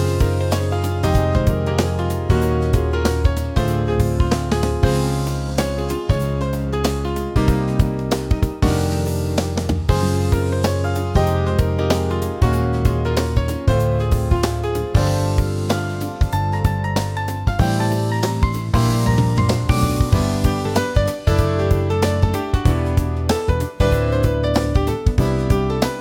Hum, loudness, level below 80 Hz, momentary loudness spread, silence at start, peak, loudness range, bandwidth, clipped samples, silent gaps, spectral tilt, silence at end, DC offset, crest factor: none; -19 LUFS; -26 dBFS; 4 LU; 0 s; -2 dBFS; 2 LU; 17 kHz; under 0.1%; none; -6.5 dB/octave; 0 s; under 0.1%; 16 dB